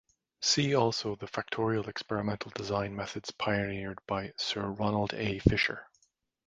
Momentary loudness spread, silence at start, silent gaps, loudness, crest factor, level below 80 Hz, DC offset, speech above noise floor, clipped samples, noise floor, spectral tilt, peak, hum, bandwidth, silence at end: 10 LU; 0.4 s; none; -32 LUFS; 26 dB; -50 dBFS; under 0.1%; 42 dB; under 0.1%; -74 dBFS; -4.5 dB/octave; -6 dBFS; none; 9.4 kHz; 0.6 s